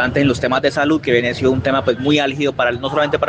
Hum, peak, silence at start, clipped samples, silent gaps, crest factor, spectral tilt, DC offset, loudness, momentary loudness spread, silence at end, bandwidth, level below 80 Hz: none; -2 dBFS; 0 s; under 0.1%; none; 14 dB; -6 dB/octave; under 0.1%; -16 LUFS; 2 LU; 0 s; 9.4 kHz; -46 dBFS